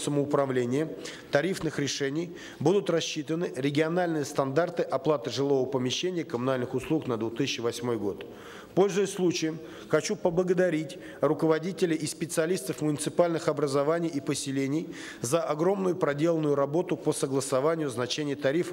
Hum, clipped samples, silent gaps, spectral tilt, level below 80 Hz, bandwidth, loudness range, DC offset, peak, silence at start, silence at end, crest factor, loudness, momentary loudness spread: none; under 0.1%; none; -5 dB/octave; -66 dBFS; 16 kHz; 2 LU; under 0.1%; -8 dBFS; 0 s; 0 s; 20 dB; -28 LUFS; 5 LU